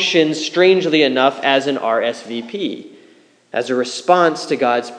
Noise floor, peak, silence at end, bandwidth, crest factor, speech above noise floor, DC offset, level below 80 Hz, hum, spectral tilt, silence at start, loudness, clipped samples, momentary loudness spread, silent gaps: -50 dBFS; 0 dBFS; 0 s; 10.5 kHz; 16 dB; 34 dB; under 0.1%; -82 dBFS; none; -4 dB/octave; 0 s; -16 LUFS; under 0.1%; 12 LU; none